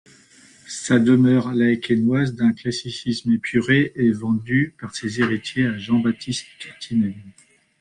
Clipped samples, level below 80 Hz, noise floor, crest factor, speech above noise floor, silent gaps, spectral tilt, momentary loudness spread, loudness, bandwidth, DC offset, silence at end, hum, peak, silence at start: under 0.1%; -56 dBFS; -51 dBFS; 16 dB; 31 dB; none; -6 dB/octave; 12 LU; -20 LUFS; 10.5 kHz; under 0.1%; 0.5 s; none; -4 dBFS; 0.7 s